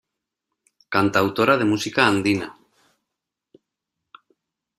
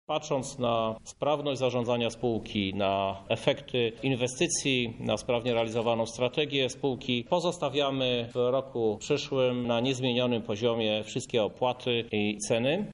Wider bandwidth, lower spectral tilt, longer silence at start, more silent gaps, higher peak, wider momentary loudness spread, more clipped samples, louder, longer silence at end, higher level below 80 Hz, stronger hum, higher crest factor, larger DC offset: first, 14.5 kHz vs 11 kHz; about the same, -5 dB/octave vs -4.5 dB/octave; first, 0.9 s vs 0.1 s; neither; first, -2 dBFS vs -8 dBFS; first, 7 LU vs 3 LU; neither; first, -20 LUFS vs -29 LUFS; first, 2.25 s vs 0 s; about the same, -62 dBFS vs -58 dBFS; neither; about the same, 22 dB vs 20 dB; neither